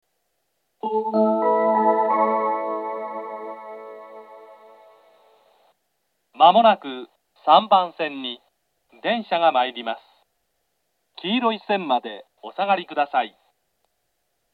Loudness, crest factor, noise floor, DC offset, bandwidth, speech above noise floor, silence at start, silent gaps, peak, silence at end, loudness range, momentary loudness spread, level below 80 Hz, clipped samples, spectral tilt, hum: -21 LUFS; 22 dB; -74 dBFS; under 0.1%; 4.7 kHz; 53 dB; 0.85 s; none; 0 dBFS; 1.25 s; 9 LU; 20 LU; -86 dBFS; under 0.1%; -7 dB/octave; none